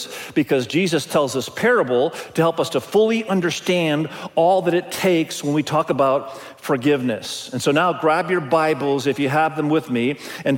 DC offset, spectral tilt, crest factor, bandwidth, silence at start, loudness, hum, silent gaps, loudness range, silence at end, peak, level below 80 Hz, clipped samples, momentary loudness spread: under 0.1%; -5 dB/octave; 16 dB; 17 kHz; 0 s; -20 LUFS; none; none; 1 LU; 0 s; -4 dBFS; -64 dBFS; under 0.1%; 6 LU